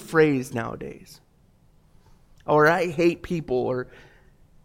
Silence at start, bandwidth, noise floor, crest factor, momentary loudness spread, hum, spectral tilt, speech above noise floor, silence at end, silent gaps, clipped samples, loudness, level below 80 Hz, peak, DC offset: 0 s; 16.5 kHz; -58 dBFS; 20 dB; 21 LU; none; -6.5 dB/octave; 35 dB; 0.8 s; none; under 0.1%; -23 LUFS; -54 dBFS; -6 dBFS; under 0.1%